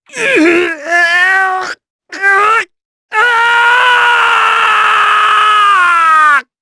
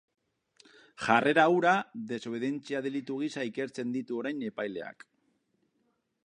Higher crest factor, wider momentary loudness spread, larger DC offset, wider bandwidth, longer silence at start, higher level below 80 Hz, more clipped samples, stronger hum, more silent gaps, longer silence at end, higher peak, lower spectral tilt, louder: second, 10 dB vs 24 dB; second, 7 LU vs 13 LU; neither; about the same, 11 kHz vs 10.5 kHz; second, 0.15 s vs 1 s; first, -58 dBFS vs -76 dBFS; neither; neither; first, 1.90-1.99 s, 2.85-3.09 s vs none; second, 0.2 s vs 1.35 s; first, 0 dBFS vs -6 dBFS; second, -1.5 dB/octave vs -5.5 dB/octave; first, -8 LUFS vs -30 LUFS